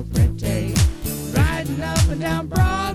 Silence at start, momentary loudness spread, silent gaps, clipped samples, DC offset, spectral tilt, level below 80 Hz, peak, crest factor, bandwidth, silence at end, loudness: 0 s; 4 LU; none; under 0.1%; under 0.1%; -5.5 dB/octave; -26 dBFS; -6 dBFS; 14 dB; 16 kHz; 0 s; -21 LUFS